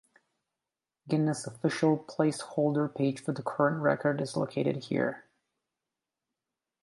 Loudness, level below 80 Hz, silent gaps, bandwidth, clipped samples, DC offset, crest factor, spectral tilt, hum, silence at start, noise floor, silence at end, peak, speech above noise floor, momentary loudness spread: -30 LUFS; -76 dBFS; none; 11.5 kHz; under 0.1%; under 0.1%; 20 dB; -6.5 dB/octave; none; 1.05 s; -90 dBFS; 1.65 s; -12 dBFS; 61 dB; 5 LU